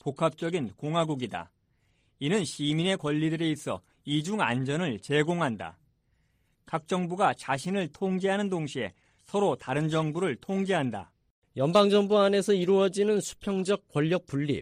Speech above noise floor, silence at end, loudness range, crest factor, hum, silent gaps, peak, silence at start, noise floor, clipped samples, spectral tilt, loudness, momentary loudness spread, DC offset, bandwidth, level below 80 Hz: 43 dB; 0 s; 5 LU; 20 dB; none; 11.31-11.42 s; -8 dBFS; 0.05 s; -70 dBFS; under 0.1%; -5.5 dB/octave; -28 LUFS; 11 LU; under 0.1%; 14.5 kHz; -66 dBFS